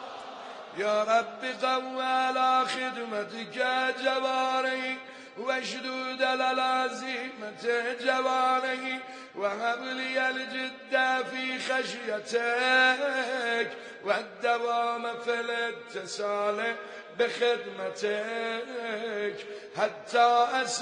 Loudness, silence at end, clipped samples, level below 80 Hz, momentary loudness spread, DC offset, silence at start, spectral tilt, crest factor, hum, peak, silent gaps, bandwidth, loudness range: -29 LUFS; 0 s; under 0.1%; -86 dBFS; 10 LU; under 0.1%; 0 s; -2 dB/octave; 18 dB; none; -12 dBFS; none; 10 kHz; 4 LU